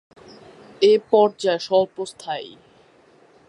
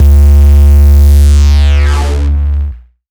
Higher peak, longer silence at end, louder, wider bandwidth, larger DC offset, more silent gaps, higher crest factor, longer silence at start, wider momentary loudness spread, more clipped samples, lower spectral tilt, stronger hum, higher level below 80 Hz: second, -4 dBFS vs 0 dBFS; first, 1 s vs 0.3 s; second, -20 LUFS vs -7 LUFS; about the same, 11 kHz vs 11.5 kHz; neither; neither; first, 18 dB vs 4 dB; first, 0.8 s vs 0 s; first, 15 LU vs 8 LU; neither; second, -4.5 dB/octave vs -6.5 dB/octave; neither; second, -70 dBFS vs -6 dBFS